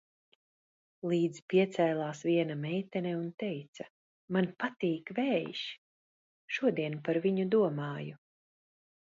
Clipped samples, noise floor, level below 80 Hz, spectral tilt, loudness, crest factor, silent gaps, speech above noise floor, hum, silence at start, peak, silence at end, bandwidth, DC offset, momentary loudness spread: under 0.1%; under -90 dBFS; -80 dBFS; -7 dB/octave; -33 LUFS; 18 dB; 1.42-1.48 s, 3.34-3.38 s, 3.68-3.73 s, 3.90-4.28 s, 5.78-6.48 s; over 58 dB; none; 1.05 s; -16 dBFS; 1.05 s; 7.8 kHz; under 0.1%; 13 LU